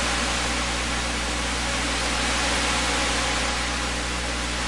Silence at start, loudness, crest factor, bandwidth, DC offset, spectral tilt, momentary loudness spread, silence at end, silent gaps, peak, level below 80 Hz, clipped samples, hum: 0 s; -23 LUFS; 14 dB; 11.5 kHz; 0.7%; -2.5 dB/octave; 4 LU; 0 s; none; -12 dBFS; -32 dBFS; under 0.1%; 60 Hz at -30 dBFS